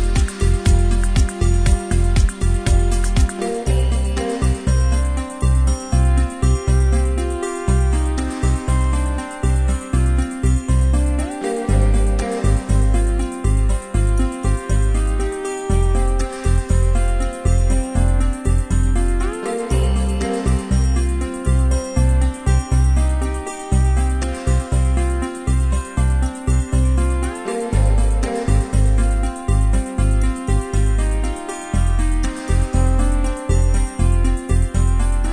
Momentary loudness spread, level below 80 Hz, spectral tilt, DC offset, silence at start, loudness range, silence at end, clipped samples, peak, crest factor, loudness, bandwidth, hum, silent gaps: 5 LU; -18 dBFS; -6 dB/octave; under 0.1%; 0 s; 1 LU; 0 s; under 0.1%; -2 dBFS; 14 dB; -19 LUFS; 11 kHz; none; none